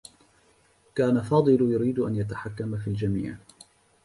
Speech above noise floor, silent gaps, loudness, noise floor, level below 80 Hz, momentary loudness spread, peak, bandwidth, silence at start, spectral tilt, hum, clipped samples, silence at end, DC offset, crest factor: 37 dB; none; -26 LUFS; -62 dBFS; -54 dBFS; 12 LU; -10 dBFS; 11.5 kHz; 0.95 s; -8.5 dB/octave; none; under 0.1%; 0.7 s; under 0.1%; 18 dB